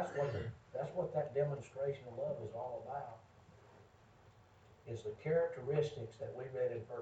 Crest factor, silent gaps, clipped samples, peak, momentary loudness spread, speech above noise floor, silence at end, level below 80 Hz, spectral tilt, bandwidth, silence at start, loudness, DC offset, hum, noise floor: 20 dB; none; under 0.1%; -22 dBFS; 10 LU; 24 dB; 0 s; -70 dBFS; -7.5 dB/octave; 8.2 kHz; 0 s; -41 LUFS; under 0.1%; none; -64 dBFS